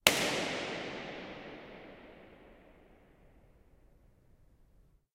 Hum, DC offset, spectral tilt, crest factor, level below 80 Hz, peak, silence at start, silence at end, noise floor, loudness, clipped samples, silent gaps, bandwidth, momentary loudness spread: none; under 0.1%; -1.5 dB/octave; 36 dB; -64 dBFS; -4 dBFS; 0.05 s; 2.5 s; -65 dBFS; -35 LUFS; under 0.1%; none; 16 kHz; 25 LU